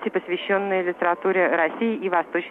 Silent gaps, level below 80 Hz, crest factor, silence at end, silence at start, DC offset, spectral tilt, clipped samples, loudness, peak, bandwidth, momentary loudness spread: none; -72 dBFS; 18 dB; 0 s; 0 s; under 0.1%; -7.5 dB/octave; under 0.1%; -23 LUFS; -6 dBFS; 4 kHz; 5 LU